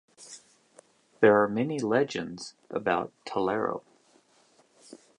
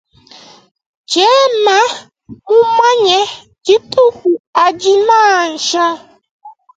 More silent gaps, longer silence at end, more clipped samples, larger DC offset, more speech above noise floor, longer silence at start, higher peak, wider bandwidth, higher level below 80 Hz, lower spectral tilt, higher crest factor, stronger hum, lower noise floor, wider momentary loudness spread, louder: second, none vs 4.40-4.53 s, 6.31-6.39 s; first, 1.4 s vs 0.25 s; neither; neither; first, 37 dB vs 30 dB; second, 0.2 s vs 1.1 s; second, -6 dBFS vs 0 dBFS; first, 11 kHz vs 9.2 kHz; second, -70 dBFS vs -60 dBFS; first, -5.5 dB/octave vs -1.5 dB/octave; first, 22 dB vs 12 dB; neither; first, -63 dBFS vs -40 dBFS; first, 24 LU vs 8 LU; second, -27 LUFS vs -11 LUFS